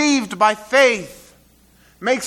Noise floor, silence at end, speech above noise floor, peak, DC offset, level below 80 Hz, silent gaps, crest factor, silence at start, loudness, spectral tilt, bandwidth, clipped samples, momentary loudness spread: -53 dBFS; 0 s; 35 dB; 0 dBFS; under 0.1%; -58 dBFS; none; 18 dB; 0 s; -17 LUFS; -2.5 dB/octave; 15 kHz; under 0.1%; 12 LU